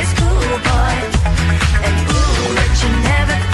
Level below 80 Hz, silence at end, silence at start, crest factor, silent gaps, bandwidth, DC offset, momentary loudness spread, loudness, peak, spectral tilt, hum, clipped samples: -16 dBFS; 0 s; 0 s; 12 dB; none; 12 kHz; under 0.1%; 1 LU; -15 LUFS; -2 dBFS; -5 dB/octave; none; under 0.1%